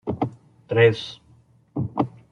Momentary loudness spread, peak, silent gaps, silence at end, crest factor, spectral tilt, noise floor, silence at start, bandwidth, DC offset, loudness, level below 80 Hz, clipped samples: 15 LU; -4 dBFS; none; 0.2 s; 20 dB; -7.5 dB/octave; -56 dBFS; 0.05 s; 7 kHz; under 0.1%; -23 LUFS; -58 dBFS; under 0.1%